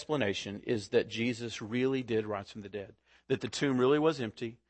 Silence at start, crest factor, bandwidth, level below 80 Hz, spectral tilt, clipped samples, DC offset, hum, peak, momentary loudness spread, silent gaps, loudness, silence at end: 0 s; 18 dB; 8.8 kHz; -68 dBFS; -5.5 dB/octave; under 0.1%; under 0.1%; none; -14 dBFS; 15 LU; none; -32 LUFS; 0.15 s